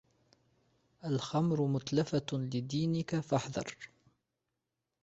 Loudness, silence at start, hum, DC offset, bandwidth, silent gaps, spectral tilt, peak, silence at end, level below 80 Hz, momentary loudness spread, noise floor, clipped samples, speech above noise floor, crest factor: -34 LUFS; 1.05 s; none; under 0.1%; 8 kHz; none; -6.5 dB/octave; -16 dBFS; 1.15 s; -68 dBFS; 12 LU; -87 dBFS; under 0.1%; 54 dB; 20 dB